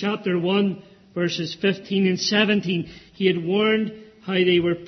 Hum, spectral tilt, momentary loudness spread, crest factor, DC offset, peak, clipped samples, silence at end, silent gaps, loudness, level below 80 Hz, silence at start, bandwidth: none; -5.5 dB/octave; 10 LU; 16 dB; under 0.1%; -6 dBFS; under 0.1%; 0 s; none; -22 LUFS; -60 dBFS; 0 s; 6.4 kHz